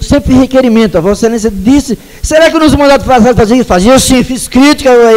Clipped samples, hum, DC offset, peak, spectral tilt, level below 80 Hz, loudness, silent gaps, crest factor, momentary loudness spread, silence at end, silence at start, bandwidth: 1%; none; under 0.1%; 0 dBFS; -5 dB/octave; -22 dBFS; -6 LUFS; none; 6 dB; 6 LU; 0 s; 0 s; 16.5 kHz